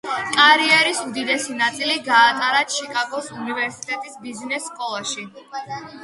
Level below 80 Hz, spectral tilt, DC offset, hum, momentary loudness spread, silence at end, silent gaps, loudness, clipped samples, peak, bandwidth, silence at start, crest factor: -70 dBFS; -1 dB/octave; under 0.1%; none; 18 LU; 0 s; none; -19 LUFS; under 0.1%; 0 dBFS; 11.5 kHz; 0.05 s; 20 dB